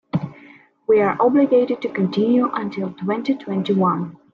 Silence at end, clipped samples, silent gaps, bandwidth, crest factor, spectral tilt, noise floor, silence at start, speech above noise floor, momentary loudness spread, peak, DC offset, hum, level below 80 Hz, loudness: 0.2 s; under 0.1%; none; 6.8 kHz; 14 dB; -9 dB/octave; -48 dBFS; 0.15 s; 29 dB; 11 LU; -6 dBFS; under 0.1%; none; -64 dBFS; -19 LUFS